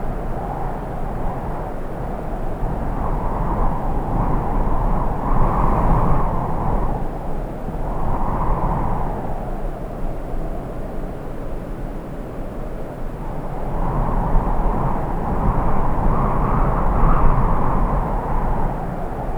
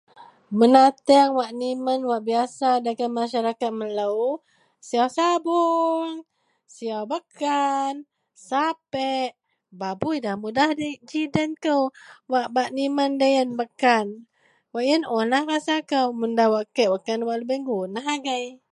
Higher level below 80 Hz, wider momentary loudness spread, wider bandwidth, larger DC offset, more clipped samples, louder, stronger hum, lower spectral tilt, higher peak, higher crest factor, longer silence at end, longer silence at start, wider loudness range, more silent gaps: first, -22 dBFS vs -68 dBFS; about the same, 11 LU vs 9 LU; second, 3.5 kHz vs 11.5 kHz; first, 0.1% vs under 0.1%; neither; about the same, -24 LUFS vs -23 LUFS; neither; first, -9 dB/octave vs -4.5 dB/octave; about the same, 0 dBFS vs -2 dBFS; about the same, 18 dB vs 22 dB; second, 0 s vs 0.2 s; second, 0 s vs 0.2 s; first, 9 LU vs 5 LU; neither